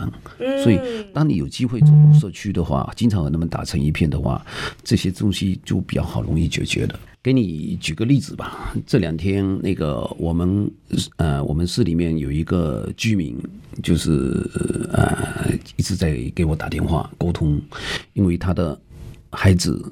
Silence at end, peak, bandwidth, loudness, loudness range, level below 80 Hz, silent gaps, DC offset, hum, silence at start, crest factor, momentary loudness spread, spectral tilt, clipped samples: 0 s; -2 dBFS; 13.5 kHz; -20 LUFS; 5 LU; -34 dBFS; none; under 0.1%; none; 0 s; 18 dB; 8 LU; -6.5 dB/octave; under 0.1%